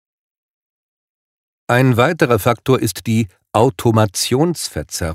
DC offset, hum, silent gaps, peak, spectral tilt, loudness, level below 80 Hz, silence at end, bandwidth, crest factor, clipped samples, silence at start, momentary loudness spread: under 0.1%; none; none; 0 dBFS; -5.5 dB/octave; -16 LUFS; -44 dBFS; 0 s; 16 kHz; 16 dB; under 0.1%; 1.7 s; 6 LU